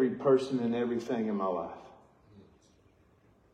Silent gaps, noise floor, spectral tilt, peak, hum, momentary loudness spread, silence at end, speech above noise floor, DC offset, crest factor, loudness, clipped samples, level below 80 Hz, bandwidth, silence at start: none; -64 dBFS; -7 dB/octave; -14 dBFS; none; 12 LU; 1.1 s; 35 dB; under 0.1%; 18 dB; -31 LUFS; under 0.1%; -72 dBFS; 9 kHz; 0 s